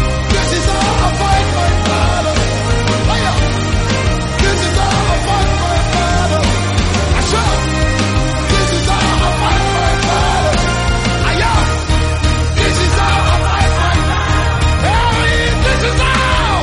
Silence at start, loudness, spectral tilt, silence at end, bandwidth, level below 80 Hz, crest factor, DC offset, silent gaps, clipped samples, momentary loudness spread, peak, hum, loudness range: 0 s; -13 LUFS; -4.5 dB/octave; 0 s; 11.5 kHz; -18 dBFS; 12 dB; under 0.1%; none; under 0.1%; 2 LU; -2 dBFS; none; 1 LU